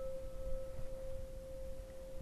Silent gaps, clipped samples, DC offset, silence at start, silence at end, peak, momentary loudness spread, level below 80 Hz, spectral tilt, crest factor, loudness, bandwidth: none; under 0.1%; under 0.1%; 0 s; 0 s; -28 dBFS; 4 LU; -46 dBFS; -6.5 dB/octave; 14 dB; -49 LUFS; 13 kHz